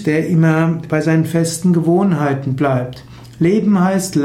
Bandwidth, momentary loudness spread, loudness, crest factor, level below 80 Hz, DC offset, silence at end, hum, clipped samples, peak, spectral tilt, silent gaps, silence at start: 14 kHz; 5 LU; -15 LUFS; 12 dB; -50 dBFS; under 0.1%; 0 s; none; under 0.1%; -4 dBFS; -7 dB/octave; none; 0 s